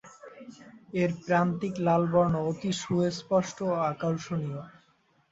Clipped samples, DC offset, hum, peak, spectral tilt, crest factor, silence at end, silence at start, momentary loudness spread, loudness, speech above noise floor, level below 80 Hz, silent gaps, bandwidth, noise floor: under 0.1%; under 0.1%; none; -12 dBFS; -6.5 dB/octave; 18 dB; 0.6 s; 0.05 s; 20 LU; -28 LUFS; 39 dB; -62 dBFS; none; 8 kHz; -67 dBFS